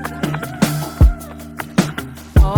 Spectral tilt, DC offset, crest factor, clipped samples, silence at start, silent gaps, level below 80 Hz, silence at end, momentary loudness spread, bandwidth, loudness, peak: -6 dB/octave; under 0.1%; 16 dB; under 0.1%; 0 s; none; -20 dBFS; 0 s; 14 LU; 19 kHz; -18 LUFS; 0 dBFS